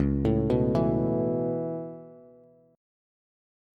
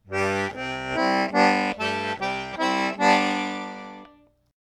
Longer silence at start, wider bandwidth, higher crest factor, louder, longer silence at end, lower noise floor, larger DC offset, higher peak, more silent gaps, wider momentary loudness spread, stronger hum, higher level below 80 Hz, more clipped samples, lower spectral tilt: about the same, 0 s vs 0.05 s; second, 6.2 kHz vs 13.5 kHz; about the same, 16 dB vs 18 dB; second, -27 LUFS vs -23 LUFS; first, 1.55 s vs 0.6 s; about the same, -56 dBFS vs -55 dBFS; neither; second, -12 dBFS vs -6 dBFS; neither; about the same, 13 LU vs 11 LU; neither; first, -42 dBFS vs -58 dBFS; neither; first, -10.5 dB/octave vs -4.5 dB/octave